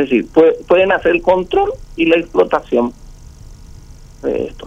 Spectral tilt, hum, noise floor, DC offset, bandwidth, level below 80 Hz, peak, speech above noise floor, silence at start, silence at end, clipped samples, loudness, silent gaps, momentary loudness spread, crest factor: -6.5 dB/octave; none; -37 dBFS; under 0.1%; 8.2 kHz; -38 dBFS; 0 dBFS; 23 dB; 0 s; 0 s; under 0.1%; -14 LUFS; none; 9 LU; 14 dB